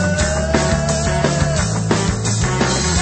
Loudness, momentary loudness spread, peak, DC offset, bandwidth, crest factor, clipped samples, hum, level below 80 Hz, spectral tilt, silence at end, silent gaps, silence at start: -17 LUFS; 1 LU; 0 dBFS; under 0.1%; 8.8 kHz; 16 dB; under 0.1%; none; -26 dBFS; -4.5 dB/octave; 0 s; none; 0 s